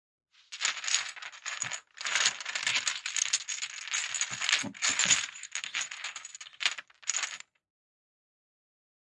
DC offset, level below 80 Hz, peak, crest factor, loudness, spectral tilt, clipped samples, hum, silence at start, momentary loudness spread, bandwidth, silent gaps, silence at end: under 0.1%; -80 dBFS; -4 dBFS; 30 dB; -30 LUFS; 2 dB/octave; under 0.1%; none; 0.5 s; 12 LU; 11.5 kHz; none; 1.75 s